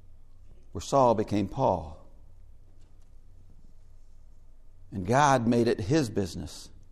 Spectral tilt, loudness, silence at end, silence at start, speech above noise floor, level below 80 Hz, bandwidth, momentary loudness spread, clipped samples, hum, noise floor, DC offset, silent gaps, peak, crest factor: -6 dB/octave; -26 LUFS; 0.05 s; 0.1 s; 23 dB; -50 dBFS; 13.5 kHz; 19 LU; under 0.1%; none; -49 dBFS; under 0.1%; none; -8 dBFS; 22 dB